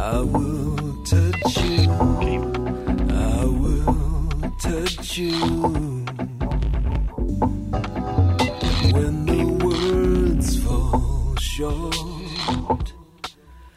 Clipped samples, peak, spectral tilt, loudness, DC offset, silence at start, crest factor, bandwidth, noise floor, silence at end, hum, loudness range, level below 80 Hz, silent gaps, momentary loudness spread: under 0.1%; -6 dBFS; -6 dB/octave; -22 LUFS; under 0.1%; 0 s; 14 dB; 15 kHz; -44 dBFS; 0.05 s; none; 4 LU; -26 dBFS; none; 8 LU